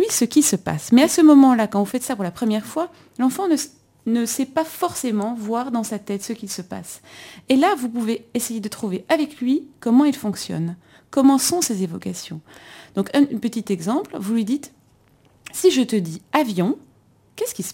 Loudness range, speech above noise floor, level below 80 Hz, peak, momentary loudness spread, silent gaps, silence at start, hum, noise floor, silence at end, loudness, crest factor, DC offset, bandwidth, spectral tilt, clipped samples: 7 LU; 36 dB; -62 dBFS; -2 dBFS; 14 LU; none; 0 s; none; -56 dBFS; 0 s; -20 LUFS; 18 dB; under 0.1%; 16.5 kHz; -4.5 dB/octave; under 0.1%